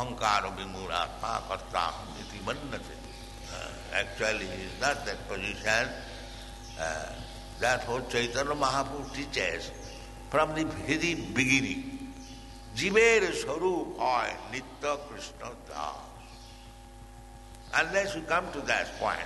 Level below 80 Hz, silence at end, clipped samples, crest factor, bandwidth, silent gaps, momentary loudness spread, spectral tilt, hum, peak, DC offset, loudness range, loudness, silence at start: -48 dBFS; 0 s; under 0.1%; 22 dB; 12 kHz; none; 18 LU; -3.5 dB/octave; none; -8 dBFS; under 0.1%; 8 LU; -30 LUFS; 0 s